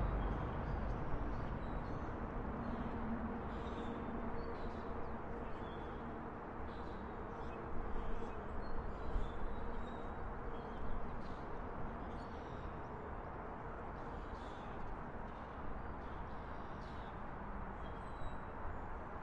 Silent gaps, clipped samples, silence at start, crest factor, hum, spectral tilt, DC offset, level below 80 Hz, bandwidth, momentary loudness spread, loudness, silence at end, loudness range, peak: none; under 0.1%; 0 s; 16 dB; none; -8.5 dB/octave; under 0.1%; -48 dBFS; 6.4 kHz; 5 LU; -46 LUFS; 0 s; 4 LU; -26 dBFS